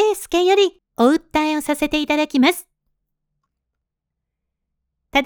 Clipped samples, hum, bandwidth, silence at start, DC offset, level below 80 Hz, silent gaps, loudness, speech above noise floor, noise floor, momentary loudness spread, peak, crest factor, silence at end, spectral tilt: under 0.1%; none; over 20 kHz; 0 s; under 0.1%; -50 dBFS; none; -18 LUFS; 63 dB; -81 dBFS; 5 LU; -2 dBFS; 18 dB; 0 s; -3 dB/octave